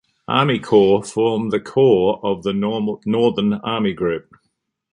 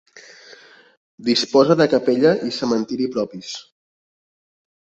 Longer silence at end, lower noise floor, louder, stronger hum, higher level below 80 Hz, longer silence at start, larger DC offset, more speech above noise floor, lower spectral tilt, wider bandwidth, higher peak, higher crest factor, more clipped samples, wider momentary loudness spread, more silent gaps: second, 0.75 s vs 1.25 s; first, -72 dBFS vs -47 dBFS; about the same, -18 LUFS vs -18 LUFS; neither; first, -54 dBFS vs -64 dBFS; first, 0.3 s vs 0.15 s; neither; first, 54 dB vs 29 dB; first, -6.5 dB/octave vs -5 dB/octave; first, 11 kHz vs 8.2 kHz; about the same, -2 dBFS vs -2 dBFS; about the same, 16 dB vs 20 dB; neither; second, 8 LU vs 14 LU; second, none vs 0.97-1.18 s